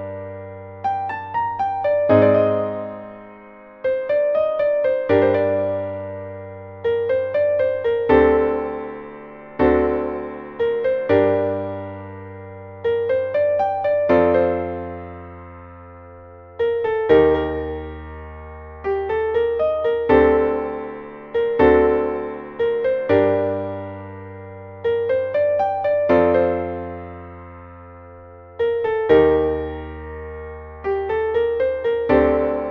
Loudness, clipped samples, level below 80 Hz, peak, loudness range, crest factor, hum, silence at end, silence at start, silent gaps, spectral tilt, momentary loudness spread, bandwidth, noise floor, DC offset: -19 LUFS; under 0.1%; -42 dBFS; -2 dBFS; 3 LU; 18 dB; none; 0 s; 0 s; none; -9 dB/octave; 21 LU; 5.2 kHz; -42 dBFS; under 0.1%